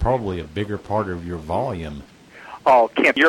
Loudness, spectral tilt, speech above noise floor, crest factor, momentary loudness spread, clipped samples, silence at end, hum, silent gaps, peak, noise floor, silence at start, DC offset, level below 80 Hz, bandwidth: -21 LUFS; -6 dB/octave; 21 dB; 16 dB; 17 LU; under 0.1%; 0 s; none; none; -6 dBFS; -41 dBFS; 0 s; under 0.1%; -38 dBFS; 16.5 kHz